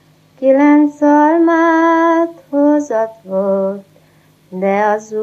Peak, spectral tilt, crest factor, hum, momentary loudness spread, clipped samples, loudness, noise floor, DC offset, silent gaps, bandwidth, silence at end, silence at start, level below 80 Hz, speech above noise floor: 0 dBFS; -7 dB/octave; 14 dB; none; 9 LU; under 0.1%; -13 LUFS; -50 dBFS; under 0.1%; none; 7.6 kHz; 0 s; 0.4 s; -72 dBFS; 37 dB